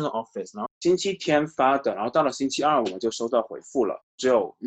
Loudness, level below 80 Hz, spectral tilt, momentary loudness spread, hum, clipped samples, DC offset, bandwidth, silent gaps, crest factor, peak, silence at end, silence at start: -25 LUFS; -64 dBFS; -4.5 dB/octave; 8 LU; none; under 0.1%; under 0.1%; 9 kHz; 0.71-0.81 s, 4.03-4.18 s; 16 dB; -8 dBFS; 0 s; 0 s